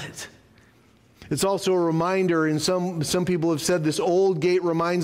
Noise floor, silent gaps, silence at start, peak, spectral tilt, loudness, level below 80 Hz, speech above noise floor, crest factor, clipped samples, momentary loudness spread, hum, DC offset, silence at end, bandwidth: -57 dBFS; none; 0 s; -12 dBFS; -5 dB/octave; -23 LUFS; -58 dBFS; 34 dB; 12 dB; under 0.1%; 5 LU; none; under 0.1%; 0 s; 16 kHz